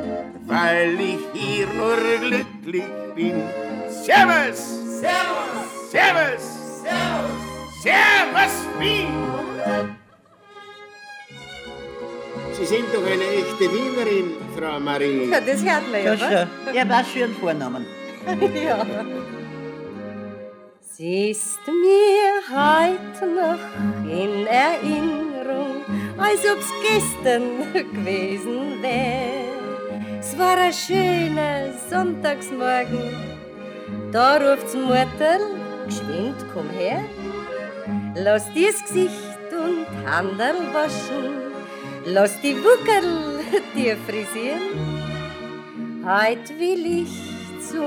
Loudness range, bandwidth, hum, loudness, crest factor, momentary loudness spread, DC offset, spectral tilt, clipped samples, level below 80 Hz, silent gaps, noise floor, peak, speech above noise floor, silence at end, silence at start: 6 LU; over 20 kHz; none; -21 LUFS; 20 dB; 16 LU; under 0.1%; -4 dB/octave; under 0.1%; -54 dBFS; none; -52 dBFS; -2 dBFS; 31 dB; 0 s; 0 s